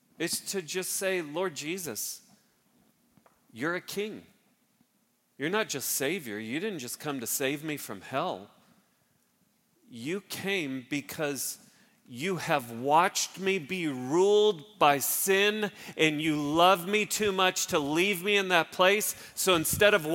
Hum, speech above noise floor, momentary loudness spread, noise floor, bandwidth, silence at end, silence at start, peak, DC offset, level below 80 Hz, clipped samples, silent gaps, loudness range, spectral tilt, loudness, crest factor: none; 43 dB; 12 LU; -72 dBFS; 17 kHz; 0 s; 0.2 s; -6 dBFS; under 0.1%; -68 dBFS; under 0.1%; none; 11 LU; -3 dB/octave; -28 LUFS; 24 dB